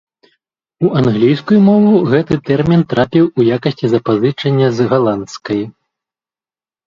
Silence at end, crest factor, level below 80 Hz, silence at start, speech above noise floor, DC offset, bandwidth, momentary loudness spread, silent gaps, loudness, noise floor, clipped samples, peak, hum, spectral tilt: 1.15 s; 14 dB; -48 dBFS; 0.8 s; over 78 dB; under 0.1%; 7.4 kHz; 10 LU; none; -13 LUFS; under -90 dBFS; under 0.1%; 0 dBFS; none; -8 dB/octave